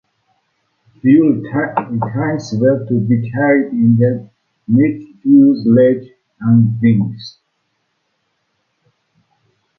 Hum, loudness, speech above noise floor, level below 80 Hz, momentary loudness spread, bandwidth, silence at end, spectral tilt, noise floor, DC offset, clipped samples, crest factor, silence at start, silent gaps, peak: none; -14 LUFS; 55 dB; -54 dBFS; 12 LU; 7 kHz; 2.5 s; -9 dB/octave; -67 dBFS; under 0.1%; under 0.1%; 14 dB; 1.05 s; none; 0 dBFS